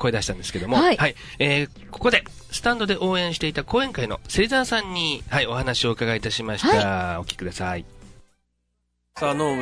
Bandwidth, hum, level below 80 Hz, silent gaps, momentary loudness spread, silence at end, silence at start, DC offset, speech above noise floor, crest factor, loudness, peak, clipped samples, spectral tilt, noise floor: 11 kHz; none; -42 dBFS; none; 9 LU; 0 s; 0 s; under 0.1%; 50 dB; 20 dB; -23 LUFS; -4 dBFS; under 0.1%; -4.5 dB/octave; -73 dBFS